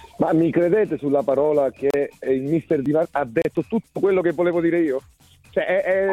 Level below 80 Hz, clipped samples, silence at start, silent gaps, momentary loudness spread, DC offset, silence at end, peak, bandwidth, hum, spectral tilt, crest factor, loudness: -56 dBFS; under 0.1%; 0 s; none; 6 LU; under 0.1%; 0 s; -8 dBFS; 12 kHz; none; -8 dB/octave; 14 dB; -21 LUFS